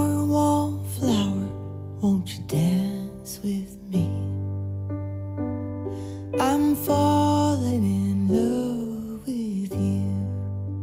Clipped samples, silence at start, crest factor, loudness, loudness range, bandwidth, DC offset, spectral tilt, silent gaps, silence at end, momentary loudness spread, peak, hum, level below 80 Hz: under 0.1%; 0 s; 14 dB; -25 LUFS; 6 LU; 16.5 kHz; under 0.1%; -7 dB/octave; none; 0 s; 11 LU; -10 dBFS; none; -52 dBFS